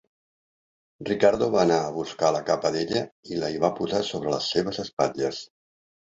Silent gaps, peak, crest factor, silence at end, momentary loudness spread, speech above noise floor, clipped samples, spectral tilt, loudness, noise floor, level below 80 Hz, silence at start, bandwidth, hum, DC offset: 3.12-3.23 s, 4.93-4.97 s; -4 dBFS; 22 dB; 0.7 s; 9 LU; over 65 dB; under 0.1%; -5 dB/octave; -25 LUFS; under -90 dBFS; -60 dBFS; 1 s; 8 kHz; none; under 0.1%